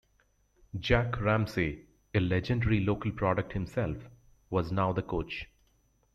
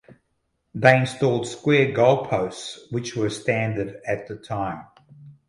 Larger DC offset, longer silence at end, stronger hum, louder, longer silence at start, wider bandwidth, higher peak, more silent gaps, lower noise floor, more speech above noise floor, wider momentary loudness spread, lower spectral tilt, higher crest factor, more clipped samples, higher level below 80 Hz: neither; first, 0.7 s vs 0.15 s; neither; second, -31 LUFS vs -22 LUFS; about the same, 0.75 s vs 0.75 s; about the same, 12.5 kHz vs 11.5 kHz; second, -12 dBFS vs 0 dBFS; neither; about the same, -70 dBFS vs -73 dBFS; second, 40 dB vs 51 dB; about the same, 11 LU vs 13 LU; first, -7.5 dB/octave vs -6 dB/octave; about the same, 20 dB vs 22 dB; neither; first, -46 dBFS vs -56 dBFS